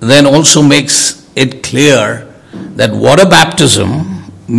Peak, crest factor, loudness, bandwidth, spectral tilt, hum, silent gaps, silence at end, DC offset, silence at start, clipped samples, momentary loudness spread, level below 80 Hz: 0 dBFS; 8 dB; -7 LUFS; 12 kHz; -3.5 dB/octave; none; none; 0 s; under 0.1%; 0 s; 5%; 17 LU; -42 dBFS